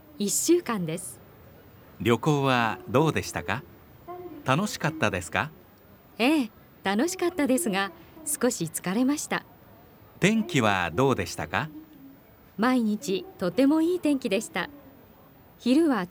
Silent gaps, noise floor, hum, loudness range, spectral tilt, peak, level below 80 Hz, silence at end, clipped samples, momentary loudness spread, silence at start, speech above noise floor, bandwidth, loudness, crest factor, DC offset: none; -53 dBFS; none; 2 LU; -4.5 dB/octave; -6 dBFS; -60 dBFS; 0 s; under 0.1%; 12 LU; 0.15 s; 28 dB; 19 kHz; -26 LUFS; 22 dB; under 0.1%